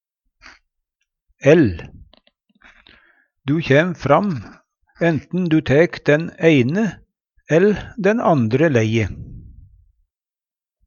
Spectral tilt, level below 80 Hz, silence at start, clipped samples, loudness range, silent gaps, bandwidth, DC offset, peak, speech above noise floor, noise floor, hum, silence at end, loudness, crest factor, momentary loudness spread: -7.5 dB/octave; -46 dBFS; 1.45 s; under 0.1%; 4 LU; none; 7.2 kHz; under 0.1%; 0 dBFS; over 74 dB; under -90 dBFS; none; 1.45 s; -17 LUFS; 18 dB; 10 LU